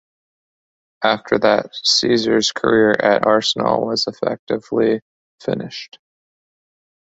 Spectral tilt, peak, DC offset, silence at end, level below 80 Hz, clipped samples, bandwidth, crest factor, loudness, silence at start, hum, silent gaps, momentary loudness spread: -3.5 dB/octave; 0 dBFS; under 0.1%; 1.35 s; -60 dBFS; under 0.1%; 8 kHz; 18 dB; -17 LUFS; 1 s; none; 4.39-4.47 s, 5.02-5.38 s; 11 LU